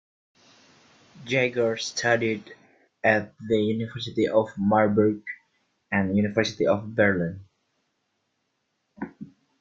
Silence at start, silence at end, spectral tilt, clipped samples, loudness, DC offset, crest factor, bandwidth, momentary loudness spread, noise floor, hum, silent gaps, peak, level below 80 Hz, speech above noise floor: 1.15 s; 0.35 s; -5.5 dB/octave; under 0.1%; -24 LUFS; under 0.1%; 20 dB; 7.8 kHz; 17 LU; -76 dBFS; none; none; -6 dBFS; -62 dBFS; 52 dB